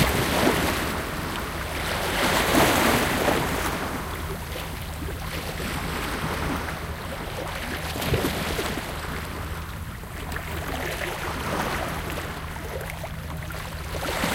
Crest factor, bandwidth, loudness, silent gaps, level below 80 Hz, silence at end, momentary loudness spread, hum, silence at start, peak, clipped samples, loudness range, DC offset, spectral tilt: 22 dB; 17 kHz; -27 LUFS; none; -36 dBFS; 0 s; 12 LU; none; 0 s; -4 dBFS; under 0.1%; 7 LU; under 0.1%; -4 dB/octave